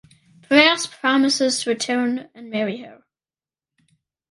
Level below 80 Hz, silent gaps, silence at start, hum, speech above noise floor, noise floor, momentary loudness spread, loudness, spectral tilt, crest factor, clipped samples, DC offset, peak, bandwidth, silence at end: -70 dBFS; none; 0.5 s; none; over 68 dB; under -90 dBFS; 14 LU; -19 LUFS; -2.5 dB/octave; 20 dB; under 0.1%; under 0.1%; -2 dBFS; 11.5 kHz; 1.35 s